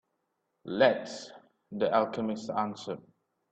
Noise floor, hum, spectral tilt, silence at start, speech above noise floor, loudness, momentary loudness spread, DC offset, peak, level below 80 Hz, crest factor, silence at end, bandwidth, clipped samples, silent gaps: -80 dBFS; none; -5 dB/octave; 0.65 s; 50 dB; -30 LUFS; 18 LU; under 0.1%; -10 dBFS; -74 dBFS; 22 dB; 0.5 s; 8.6 kHz; under 0.1%; none